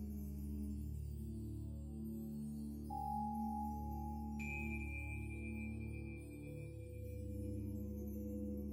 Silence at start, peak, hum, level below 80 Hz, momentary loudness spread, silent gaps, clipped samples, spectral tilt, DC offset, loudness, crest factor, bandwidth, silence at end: 0 s; -32 dBFS; none; -50 dBFS; 7 LU; none; under 0.1%; -8 dB/octave; under 0.1%; -46 LUFS; 12 dB; 16 kHz; 0 s